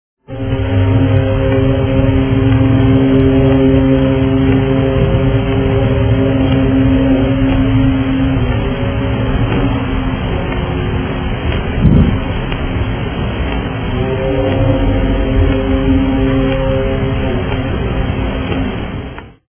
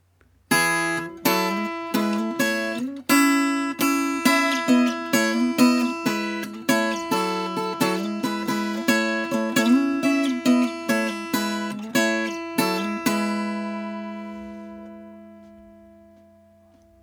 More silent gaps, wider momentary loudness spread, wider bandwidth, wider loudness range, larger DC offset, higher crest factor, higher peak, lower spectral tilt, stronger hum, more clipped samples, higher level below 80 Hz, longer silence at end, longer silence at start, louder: neither; about the same, 8 LU vs 10 LU; second, 3.5 kHz vs over 20 kHz; about the same, 5 LU vs 7 LU; neither; second, 12 dB vs 20 dB; first, 0 dBFS vs -4 dBFS; first, -12 dB/octave vs -3.5 dB/octave; neither; neither; first, -20 dBFS vs -66 dBFS; second, 0.2 s vs 1.3 s; second, 0.3 s vs 0.5 s; first, -14 LUFS vs -22 LUFS